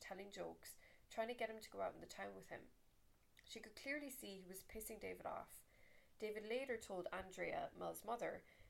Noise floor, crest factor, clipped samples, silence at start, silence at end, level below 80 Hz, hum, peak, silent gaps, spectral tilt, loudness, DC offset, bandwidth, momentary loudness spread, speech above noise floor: -73 dBFS; 18 dB; under 0.1%; 0 s; 0 s; -74 dBFS; none; -34 dBFS; none; -3.5 dB/octave; -50 LUFS; under 0.1%; 16.5 kHz; 12 LU; 23 dB